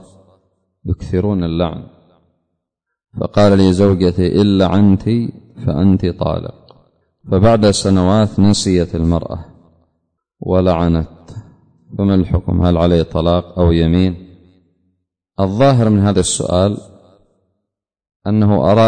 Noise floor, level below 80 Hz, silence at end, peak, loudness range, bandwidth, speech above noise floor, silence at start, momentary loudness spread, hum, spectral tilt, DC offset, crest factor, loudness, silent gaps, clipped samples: -78 dBFS; -32 dBFS; 0 s; -2 dBFS; 5 LU; 9.6 kHz; 65 dB; 0.85 s; 16 LU; none; -6.5 dB/octave; under 0.1%; 14 dB; -14 LUFS; 18.16-18.20 s; under 0.1%